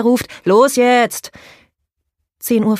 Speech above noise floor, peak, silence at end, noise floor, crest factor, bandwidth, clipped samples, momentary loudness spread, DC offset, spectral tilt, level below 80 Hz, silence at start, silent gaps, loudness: 60 dB; 0 dBFS; 0 s; -74 dBFS; 14 dB; 15.5 kHz; under 0.1%; 16 LU; under 0.1%; -4.5 dB/octave; -56 dBFS; 0 s; none; -14 LUFS